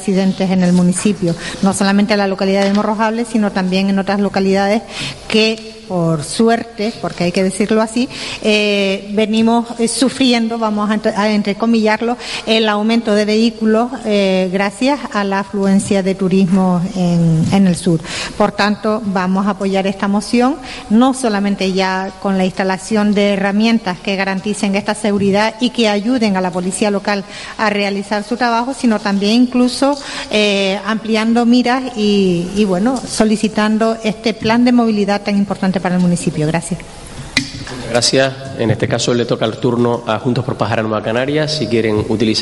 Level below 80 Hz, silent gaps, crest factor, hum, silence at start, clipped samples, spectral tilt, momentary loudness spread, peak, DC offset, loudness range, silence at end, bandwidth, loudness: -44 dBFS; none; 14 dB; none; 0 s; under 0.1%; -5.5 dB/octave; 6 LU; 0 dBFS; under 0.1%; 2 LU; 0 s; 11.5 kHz; -15 LUFS